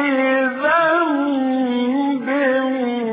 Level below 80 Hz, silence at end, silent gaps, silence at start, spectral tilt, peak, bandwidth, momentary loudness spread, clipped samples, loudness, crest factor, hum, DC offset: -66 dBFS; 0 s; none; 0 s; -9.5 dB/octave; -6 dBFS; 4.8 kHz; 4 LU; under 0.1%; -18 LUFS; 12 dB; none; under 0.1%